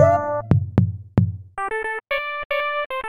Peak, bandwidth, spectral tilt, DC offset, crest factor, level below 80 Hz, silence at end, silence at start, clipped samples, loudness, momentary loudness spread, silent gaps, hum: -2 dBFS; 12.5 kHz; -8 dB/octave; under 0.1%; 18 dB; -42 dBFS; 0 s; 0 s; under 0.1%; -22 LUFS; 7 LU; 2.45-2.50 s, 2.86-2.90 s; none